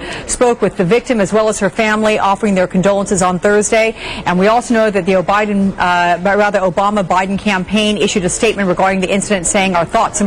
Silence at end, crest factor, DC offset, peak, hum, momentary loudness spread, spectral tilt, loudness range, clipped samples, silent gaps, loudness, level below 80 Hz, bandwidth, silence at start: 0 s; 8 dB; under 0.1%; -4 dBFS; none; 3 LU; -4.5 dB/octave; 1 LU; under 0.1%; none; -13 LUFS; -38 dBFS; 13 kHz; 0 s